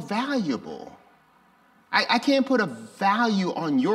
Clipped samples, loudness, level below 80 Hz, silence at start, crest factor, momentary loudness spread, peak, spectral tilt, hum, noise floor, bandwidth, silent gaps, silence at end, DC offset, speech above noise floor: under 0.1%; -24 LUFS; -72 dBFS; 0 s; 18 dB; 10 LU; -6 dBFS; -5 dB/octave; none; -59 dBFS; 13 kHz; none; 0 s; under 0.1%; 35 dB